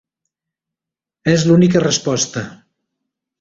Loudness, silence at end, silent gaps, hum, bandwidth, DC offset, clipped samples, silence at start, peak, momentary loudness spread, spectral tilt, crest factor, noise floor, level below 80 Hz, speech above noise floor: -15 LUFS; 0.85 s; none; none; 8 kHz; under 0.1%; under 0.1%; 1.25 s; -2 dBFS; 13 LU; -5 dB/octave; 16 dB; -87 dBFS; -52 dBFS; 72 dB